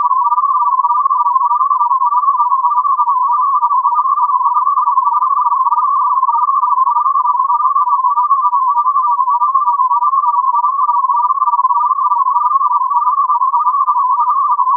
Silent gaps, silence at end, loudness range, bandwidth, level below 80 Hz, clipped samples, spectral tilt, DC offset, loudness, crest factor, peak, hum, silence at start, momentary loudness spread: none; 0 s; 0 LU; 1.4 kHz; under -90 dBFS; under 0.1%; -2 dB/octave; under 0.1%; -12 LUFS; 10 dB; -2 dBFS; none; 0 s; 1 LU